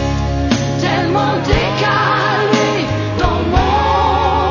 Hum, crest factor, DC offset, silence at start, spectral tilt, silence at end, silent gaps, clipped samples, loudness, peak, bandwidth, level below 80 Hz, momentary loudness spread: none; 14 dB; under 0.1%; 0 s; -5.5 dB/octave; 0 s; none; under 0.1%; -15 LUFS; 0 dBFS; 7.4 kHz; -24 dBFS; 3 LU